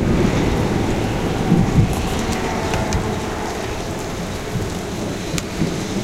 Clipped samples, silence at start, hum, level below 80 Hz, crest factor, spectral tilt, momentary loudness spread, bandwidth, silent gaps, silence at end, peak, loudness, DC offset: under 0.1%; 0 s; none; -30 dBFS; 20 dB; -5.5 dB/octave; 8 LU; 16.5 kHz; none; 0 s; 0 dBFS; -21 LUFS; under 0.1%